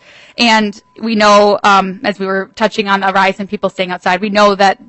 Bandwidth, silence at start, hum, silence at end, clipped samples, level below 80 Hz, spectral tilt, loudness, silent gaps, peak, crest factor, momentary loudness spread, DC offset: 8.4 kHz; 0.4 s; none; 0.15 s; under 0.1%; -52 dBFS; -4 dB/octave; -12 LUFS; none; 0 dBFS; 12 dB; 10 LU; under 0.1%